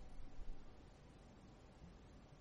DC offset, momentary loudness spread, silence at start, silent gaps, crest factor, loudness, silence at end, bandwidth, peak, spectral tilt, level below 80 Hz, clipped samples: under 0.1%; 4 LU; 0 s; none; 16 dB; -62 LUFS; 0 s; 8 kHz; -36 dBFS; -6 dB/octave; -56 dBFS; under 0.1%